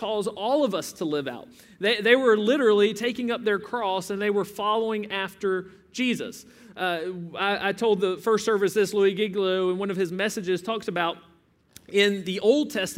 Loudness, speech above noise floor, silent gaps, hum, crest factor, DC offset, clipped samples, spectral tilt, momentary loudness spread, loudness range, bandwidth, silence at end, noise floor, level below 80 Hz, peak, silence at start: -25 LUFS; 30 dB; none; none; 20 dB; under 0.1%; under 0.1%; -4.5 dB/octave; 10 LU; 5 LU; 16 kHz; 0 s; -54 dBFS; -68 dBFS; -6 dBFS; 0 s